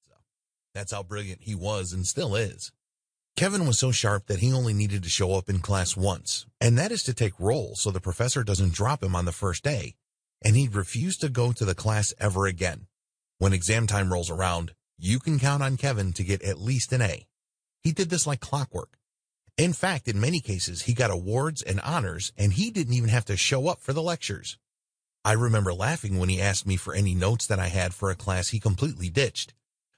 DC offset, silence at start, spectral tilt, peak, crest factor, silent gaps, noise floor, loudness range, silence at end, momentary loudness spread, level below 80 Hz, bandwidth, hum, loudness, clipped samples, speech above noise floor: under 0.1%; 0.75 s; -4.5 dB/octave; -6 dBFS; 20 dB; none; under -90 dBFS; 2 LU; 0.5 s; 9 LU; -48 dBFS; 10.5 kHz; none; -26 LUFS; under 0.1%; over 64 dB